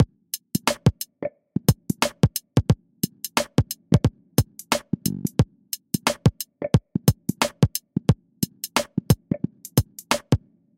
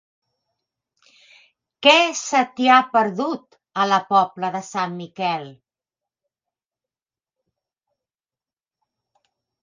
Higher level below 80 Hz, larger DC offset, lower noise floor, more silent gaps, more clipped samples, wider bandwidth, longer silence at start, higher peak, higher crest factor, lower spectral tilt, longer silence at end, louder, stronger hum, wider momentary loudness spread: first, -40 dBFS vs -78 dBFS; neither; second, -38 dBFS vs under -90 dBFS; neither; neither; first, 16.5 kHz vs 9.6 kHz; second, 0 s vs 1.8 s; about the same, -2 dBFS vs 0 dBFS; about the same, 22 dB vs 22 dB; first, -5 dB/octave vs -3 dB/octave; second, 0.4 s vs 4.1 s; second, -24 LUFS vs -19 LUFS; neither; second, 7 LU vs 13 LU